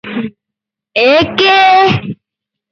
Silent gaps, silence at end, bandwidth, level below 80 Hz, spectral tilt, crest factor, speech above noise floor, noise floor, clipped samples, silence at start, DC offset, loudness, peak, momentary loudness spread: none; 0.6 s; 7 kHz; -46 dBFS; -5.5 dB/octave; 12 dB; 73 dB; -81 dBFS; under 0.1%; 0.05 s; under 0.1%; -9 LUFS; 0 dBFS; 19 LU